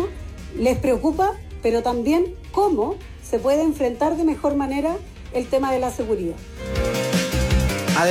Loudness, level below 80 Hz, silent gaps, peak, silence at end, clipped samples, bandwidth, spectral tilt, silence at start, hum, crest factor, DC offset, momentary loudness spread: -22 LUFS; -32 dBFS; none; -8 dBFS; 0 s; under 0.1%; 16.5 kHz; -5.5 dB/octave; 0 s; none; 14 dB; under 0.1%; 9 LU